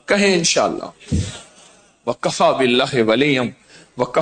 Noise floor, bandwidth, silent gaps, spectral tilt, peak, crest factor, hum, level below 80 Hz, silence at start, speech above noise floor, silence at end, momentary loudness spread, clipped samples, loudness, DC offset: -49 dBFS; 9.4 kHz; none; -4 dB/octave; -2 dBFS; 16 dB; none; -42 dBFS; 0.1 s; 32 dB; 0 s; 14 LU; under 0.1%; -17 LUFS; under 0.1%